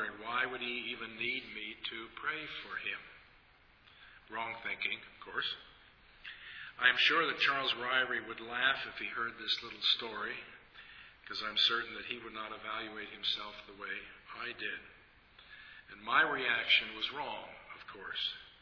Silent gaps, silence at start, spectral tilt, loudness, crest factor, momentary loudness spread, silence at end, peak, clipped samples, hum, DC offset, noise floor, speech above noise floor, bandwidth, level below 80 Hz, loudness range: none; 0 s; -2.5 dB/octave; -34 LUFS; 26 dB; 20 LU; 0.05 s; -12 dBFS; under 0.1%; none; under 0.1%; -64 dBFS; 28 dB; 5.4 kHz; -70 dBFS; 10 LU